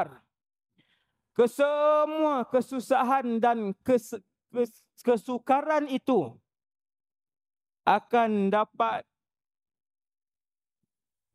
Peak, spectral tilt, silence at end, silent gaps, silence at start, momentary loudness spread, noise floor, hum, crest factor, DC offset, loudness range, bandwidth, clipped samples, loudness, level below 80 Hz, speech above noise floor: -8 dBFS; -6 dB/octave; 2.35 s; none; 0 s; 9 LU; under -90 dBFS; none; 22 dB; under 0.1%; 4 LU; 15 kHz; under 0.1%; -27 LUFS; -78 dBFS; over 64 dB